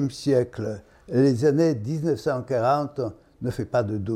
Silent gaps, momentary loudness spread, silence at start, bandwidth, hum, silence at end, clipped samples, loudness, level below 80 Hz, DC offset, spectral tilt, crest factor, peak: none; 12 LU; 0 s; 14 kHz; none; 0 s; under 0.1%; -24 LUFS; -58 dBFS; under 0.1%; -7.5 dB/octave; 14 dB; -8 dBFS